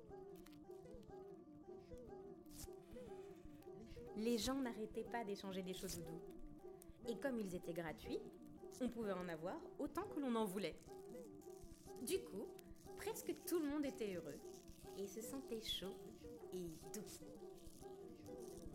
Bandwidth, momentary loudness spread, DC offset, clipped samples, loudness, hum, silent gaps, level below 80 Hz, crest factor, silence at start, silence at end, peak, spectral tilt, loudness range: 16.5 kHz; 15 LU; under 0.1%; under 0.1%; -49 LUFS; none; none; -66 dBFS; 20 dB; 0 s; 0 s; -30 dBFS; -4.5 dB/octave; 5 LU